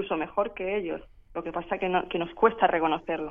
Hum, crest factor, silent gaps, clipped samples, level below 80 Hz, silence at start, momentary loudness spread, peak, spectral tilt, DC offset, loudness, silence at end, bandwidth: none; 22 dB; none; under 0.1%; -54 dBFS; 0 s; 13 LU; -6 dBFS; -8 dB/octave; under 0.1%; -28 LUFS; 0 s; 3.7 kHz